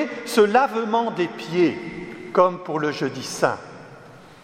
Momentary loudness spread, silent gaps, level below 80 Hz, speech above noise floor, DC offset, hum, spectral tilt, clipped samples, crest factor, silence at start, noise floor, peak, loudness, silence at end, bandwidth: 16 LU; none; -62 dBFS; 23 dB; under 0.1%; none; -5 dB/octave; under 0.1%; 20 dB; 0 s; -45 dBFS; -2 dBFS; -22 LUFS; 0.1 s; 16 kHz